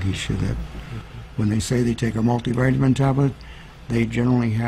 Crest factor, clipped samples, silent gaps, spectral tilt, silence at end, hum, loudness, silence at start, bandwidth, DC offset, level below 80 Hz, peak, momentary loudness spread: 14 dB; under 0.1%; none; -7 dB/octave; 0 s; none; -22 LUFS; 0 s; 13 kHz; under 0.1%; -38 dBFS; -8 dBFS; 17 LU